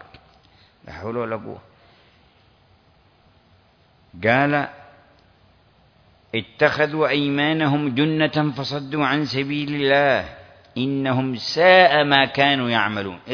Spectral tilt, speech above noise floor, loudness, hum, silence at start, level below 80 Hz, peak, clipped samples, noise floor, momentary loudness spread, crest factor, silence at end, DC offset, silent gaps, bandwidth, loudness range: -6 dB/octave; 37 dB; -19 LUFS; none; 0.85 s; -58 dBFS; 0 dBFS; under 0.1%; -57 dBFS; 14 LU; 22 dB; 0 s; under 0.1%; none; 5.4 kHz; 17 LU